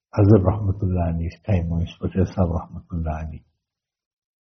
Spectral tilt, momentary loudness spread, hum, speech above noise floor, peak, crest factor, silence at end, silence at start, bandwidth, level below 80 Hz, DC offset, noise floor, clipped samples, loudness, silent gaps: -10 dB/octave; 14 LU; none; 63 dB; -2 dBFS; 20 dB; 1.05 s; 0.15 s; 6.2 kHz; -40 dBFS; under 0.1%; -84 dBFS; under 0.1%; -22 LUFS; none